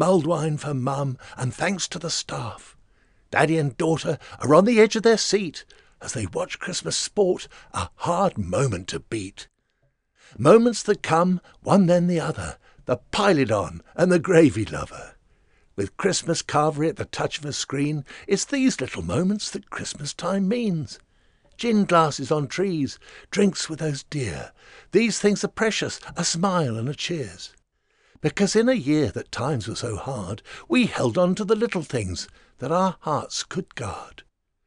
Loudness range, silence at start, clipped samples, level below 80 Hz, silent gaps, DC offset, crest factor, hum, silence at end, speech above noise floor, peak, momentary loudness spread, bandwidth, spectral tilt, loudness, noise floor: 5 LU; 0 s; under 0.1%; -52 dBFS; none; under 0.1%; 22 dB; none; 0.45 s; 46 dB; -2 dBFS; 14 LU; 11 kHz; -5 dB/octave; -23 LUFS; -69 dBFS